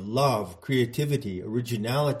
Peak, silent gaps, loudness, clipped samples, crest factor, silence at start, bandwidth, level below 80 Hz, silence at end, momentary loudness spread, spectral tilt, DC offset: -10 dBFS; none; -27 LUFS; under 0.1%; 16 dB; 0 s; 16 kHz; -60 dBFS; 0 s; 6 LU; -6 dB/octave; under 0.1%